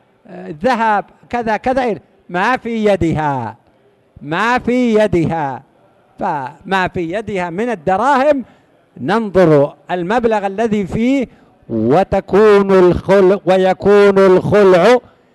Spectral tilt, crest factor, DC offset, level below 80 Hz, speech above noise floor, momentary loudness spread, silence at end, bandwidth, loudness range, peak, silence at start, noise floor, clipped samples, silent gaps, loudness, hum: -7 dB/octave; 12 dB; under 0.1%; -42 dBFS; 39 dB; 13 LU; 0.35 s; 12 kHz; 7 LU; -2 dBFS; 0.3 s; -53 dBFS; under 0.1%; none; -14 LUFS; none